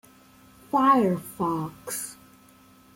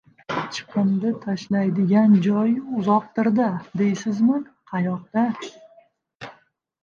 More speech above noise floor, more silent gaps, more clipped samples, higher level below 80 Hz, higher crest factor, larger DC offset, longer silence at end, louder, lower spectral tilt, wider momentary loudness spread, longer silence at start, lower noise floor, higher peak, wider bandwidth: second, 31 dB vs 39 dB; second, none vs 6.15-6.20 s; neither; about the same, -64 dBFS vs -66 dBFS; about the same, 18 dB vs 16 dB; neither; first, 0.85 s vs 0.5 s; second, -25 LUFS vs -22 LUFS; second, -5.5 dB/octave vs -7.5 dB/octave; about the same, 13 LU vs 14 LU; first, 0.75 s vs 0.3 s; second, -55 dBFS vs -59 dBFS; second, -10 dBFS vs -6 dBFS; first, 16.5 kHz vs 7.2 kHz